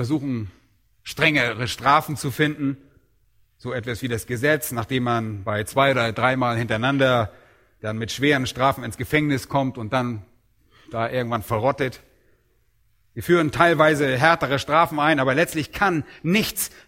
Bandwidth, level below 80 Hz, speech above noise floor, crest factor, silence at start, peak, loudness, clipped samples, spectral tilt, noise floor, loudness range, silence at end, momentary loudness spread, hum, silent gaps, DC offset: 16.5 kHz; -52 dBFS; 43 dB; 22 dB; 0 s; 0 dBFS; -21 LUFS; under 0.1%; -5 dB/octave; -65 dBFS; 6 LU; 0.2 s; 12 LU; none; none; under 0.1%